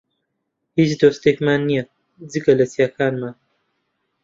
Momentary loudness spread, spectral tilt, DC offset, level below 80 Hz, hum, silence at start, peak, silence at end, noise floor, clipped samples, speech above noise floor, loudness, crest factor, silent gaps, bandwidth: 13 LU; -6.5 dB/octave; under 0.1%; -58 dBFS; none; 0.75 s; -2 dBFS; 0.9 s; -75 dBFS; under 0.1%; 58 dB; -19 LUFS; 18 dB; none; 7.6 kHz